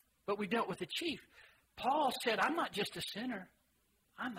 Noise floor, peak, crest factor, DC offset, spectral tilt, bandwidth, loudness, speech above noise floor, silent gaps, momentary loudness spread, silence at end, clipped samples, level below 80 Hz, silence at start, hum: -76 dBFS; -20 dBFS; 18 dB; under 0.1%; -3.5 dB/octave; 16 kHz; -37 LUFS; 39 dB; none; 11 LU; 0 s; under 0.1%; -74 dBFS; 0.25 s; none